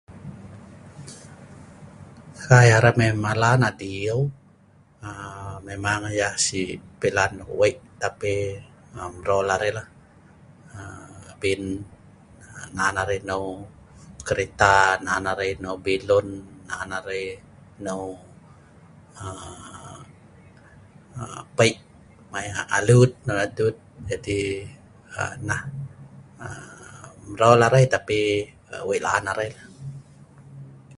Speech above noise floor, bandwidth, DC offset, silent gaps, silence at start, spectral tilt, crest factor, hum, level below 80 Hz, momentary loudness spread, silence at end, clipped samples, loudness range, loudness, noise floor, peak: 33 dB; 11.5 kHz; under 0.1%; none; 0.1 s; -5 dB/octave; 24 dB; none; -50 dBFS; 25 LU; 0.05 s; under 0.1%; 12 LU; -22 LUFS; -55 dBFS; 0 dBFS